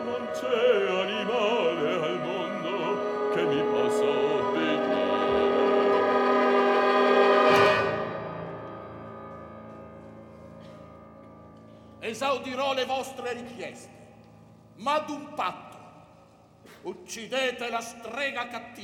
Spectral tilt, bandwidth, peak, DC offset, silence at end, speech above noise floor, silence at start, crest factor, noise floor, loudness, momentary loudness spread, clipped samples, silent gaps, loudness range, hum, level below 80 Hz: -4.5 dB/octave; 15 kHz; -8 dBFS; under 0.1%; 0 s; 25 dB; 0 s; 20 dB; -55 dBFS; -26 LUFS; 22 LU; under 0.1%; none; 15 LU; none; -64 dBFS